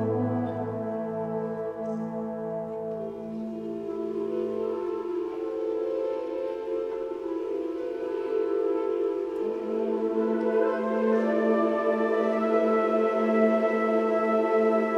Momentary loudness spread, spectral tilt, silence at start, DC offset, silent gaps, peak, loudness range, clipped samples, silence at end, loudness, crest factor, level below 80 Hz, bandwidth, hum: 9 LU; -8 dB/octave; 0 s; under 0.1%; none; -10 dBFS; 8 LU; under 0.1%; 0 s; -28 LUFS; 16 dB; -66 dBFS; 7.2 kHz; none